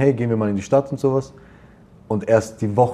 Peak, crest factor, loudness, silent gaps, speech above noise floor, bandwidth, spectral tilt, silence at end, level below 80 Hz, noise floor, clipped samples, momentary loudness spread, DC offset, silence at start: -2 dBFS; 18 dB; -20 LUFS; none; 28 dB; 12.5 kHz; -8 dB/octave; 0 s; -54 dBFS; -47 dBFS; under 0.1%; 7 LU; under 0.1%; 0 s